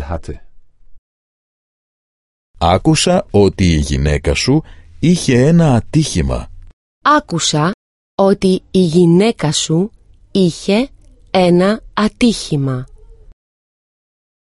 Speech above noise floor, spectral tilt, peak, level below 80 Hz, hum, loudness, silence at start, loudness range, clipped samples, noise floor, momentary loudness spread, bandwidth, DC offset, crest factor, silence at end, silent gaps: 24 dB; -5.5 dB/octave; 0 dBFS; -30 dBFS; none; -14 LUFS; 0 s; 4 LU; under 0.1%; -37 dBFS; 10 LU; 11.5 kHz; under 0.1%; 16 dB; 1.65 s; 0.98-2.54 s, 6.73-7.01 s, 7.74-8.18 s